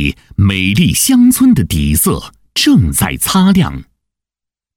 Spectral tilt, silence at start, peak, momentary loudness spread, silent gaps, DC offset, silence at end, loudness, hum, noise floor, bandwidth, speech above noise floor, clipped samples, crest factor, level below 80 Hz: -4.5 dB/octave; 0 s; 0 dBFS; 10 LU; none; under 0.1%; 0.95 s; -11 LUFS; none; -85 dBFS; 20 kHz; 74 dB; under 0.1%; 12 dB; -28 dBFS